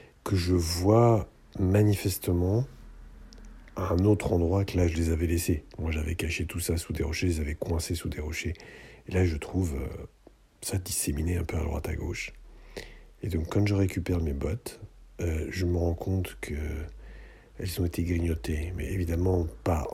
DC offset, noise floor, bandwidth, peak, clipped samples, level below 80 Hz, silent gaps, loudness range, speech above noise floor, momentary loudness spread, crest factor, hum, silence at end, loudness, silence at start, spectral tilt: under 0.1%; -48 dBFS; 16 kHz; -8 dBFS; under 0.1%; -42 dBFS; none; 6 LU; 20 dB; 15 LU; 20 dB; none; 0 s; -29 LUFS; 0.25 s; -6 dB/octave